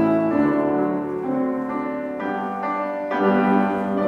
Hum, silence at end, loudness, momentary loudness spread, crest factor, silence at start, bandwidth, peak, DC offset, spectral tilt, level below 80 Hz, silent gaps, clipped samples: none; 0 s; -22 LUFS; 7 LU; 14 dB; 0 s; 6.4 kHz; -6 dBFS; under 0.1%; -9 dB/octave; -60 dBFS; none; under 0.1%